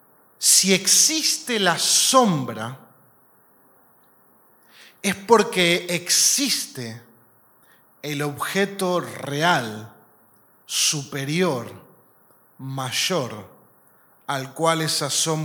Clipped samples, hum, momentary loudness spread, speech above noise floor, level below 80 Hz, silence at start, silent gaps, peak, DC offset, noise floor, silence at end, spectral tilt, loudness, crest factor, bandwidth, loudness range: under 0.1%; none; 18 LU; 35 dB; -72 dBFS; 0.4 s; none; 0 dBFS; under 0.1%; -57 dBFS; 0 s; -2 dB/octave; -20 LUFS; 22 dB; 19 kHz; 8 LU